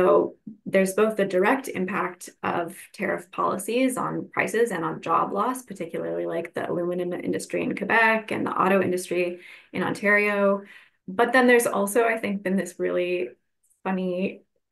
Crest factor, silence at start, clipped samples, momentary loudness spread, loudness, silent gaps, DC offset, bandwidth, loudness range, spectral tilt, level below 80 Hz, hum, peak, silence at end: 18 dB; 0 s; under 0.1%; 12 LU; -24 LUFS; none; under 0.1%; 12.5 kHz; 4 LU; -5 dB/octave; -72 dBFS; none; -6 dBFS; 0.35 s